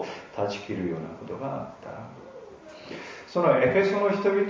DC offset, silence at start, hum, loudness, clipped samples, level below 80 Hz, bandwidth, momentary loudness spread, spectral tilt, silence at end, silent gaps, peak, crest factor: under 0.1%; 0 s; none; -26 LUFS; under 0.1%; -60 dBFS; 7.6 kHz; 23 LU; -6.5 dB/octave; 0 s; none; -8 dBFS; 18 dB